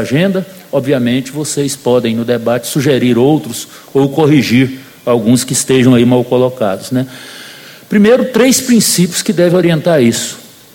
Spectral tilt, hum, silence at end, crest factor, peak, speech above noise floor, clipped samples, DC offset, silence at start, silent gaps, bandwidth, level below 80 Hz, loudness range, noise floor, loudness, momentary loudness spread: -5 dB/octave; none; 0.3 s; 12 dB; 0 dBFS; 22 dB; under 0.1%; under 0.1%; 0 s; none; 17 kHz; -50 dBFS; 3 LU; -33 dBFS; -11 LUFS; 11 LU